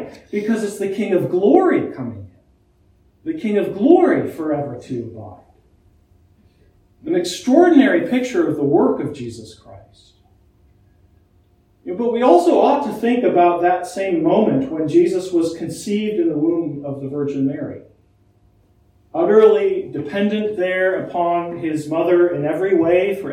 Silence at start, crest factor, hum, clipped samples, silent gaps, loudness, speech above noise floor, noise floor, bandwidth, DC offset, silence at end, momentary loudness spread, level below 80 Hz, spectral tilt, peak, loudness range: 0 s; 18 dB; none; under 0.1%; none; -17 LUFS; 39 dB; -56 dBFS; 14 kHz; under 0.1%; 0 s; 15 LU; -58 dBFS; -6.5 dB/octave; 0 dBFS; 7 LU